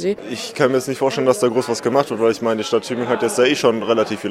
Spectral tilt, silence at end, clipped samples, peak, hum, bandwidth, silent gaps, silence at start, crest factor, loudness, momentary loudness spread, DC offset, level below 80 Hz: -4.5 dB/octave; 0 s; under 0.1%; -2 dBFS; none; 15.5 kHz; none; 0 s; 16 dB; -18 LUFS; 5 LU; under 0.1%; -66 dBFS